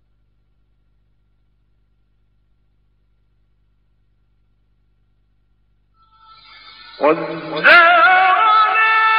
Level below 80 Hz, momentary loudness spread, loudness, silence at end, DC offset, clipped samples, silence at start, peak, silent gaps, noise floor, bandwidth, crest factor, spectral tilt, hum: -60 dBFS; 11 LU; -12 LUFS; 0 s; under 0.1%; under 0.1%; 7 s; 0 dBFS; none; -61 dBFS; 5.4 kHz; 18 dB; 0.5 dB/octave; 50 Hz at -60 dBFS